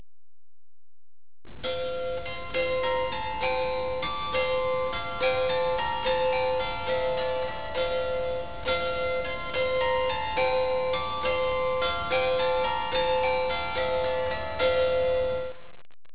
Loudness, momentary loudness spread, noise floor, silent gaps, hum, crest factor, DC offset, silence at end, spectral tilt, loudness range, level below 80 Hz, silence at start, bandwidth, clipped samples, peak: -27 LUFS; 6 LU; under -90 dBFS; none; none; 14 dB; 1%; 0.35 s; -7.5 dB/octave; 3 LU; -48 dBFS; 1.45 s; 4 kHz; under 0.1%; -12 dBFS